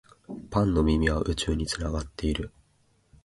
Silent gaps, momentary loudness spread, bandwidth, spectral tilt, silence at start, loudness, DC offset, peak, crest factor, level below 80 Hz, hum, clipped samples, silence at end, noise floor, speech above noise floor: none; 15 LU; 11.5 kHz; -5.5 dB/octave; 0.3 s; -27 LUFS; under 0.1%; -10 dBFS; 18 dB; -36 dBFS; none; under 0.1%; 0.75 s; -66 dBFS; 40 dB